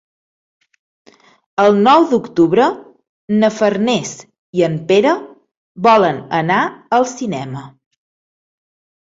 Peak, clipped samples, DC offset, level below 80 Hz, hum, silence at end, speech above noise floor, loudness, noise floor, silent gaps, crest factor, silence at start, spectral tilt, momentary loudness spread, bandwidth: 0 dBFS; under 0.1%; under 0.1%; -58 dBFS; none; 1.4 s; over 76 dB; -15 LUFS; under -90 dBFS; 3.09-3.28 s, 4.39-4.53 s, 5.57-5.75 s; 16 dB; 1.6 s; -5.5 dB/octave; 14 LU; 7.8 kHz